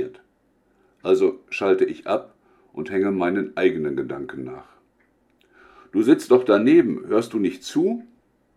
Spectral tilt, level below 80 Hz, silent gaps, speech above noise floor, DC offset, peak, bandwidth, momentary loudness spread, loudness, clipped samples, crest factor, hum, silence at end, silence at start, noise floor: -6.5 dB/octave; -66 dBFS; none; 43 dB; under 0.1%; -4 dBFS; 12.5 kHz; 17 LU; -21 LUFS; under 0.1%; 20 dB; none; 0.55 s; 0 s; -64 dBFS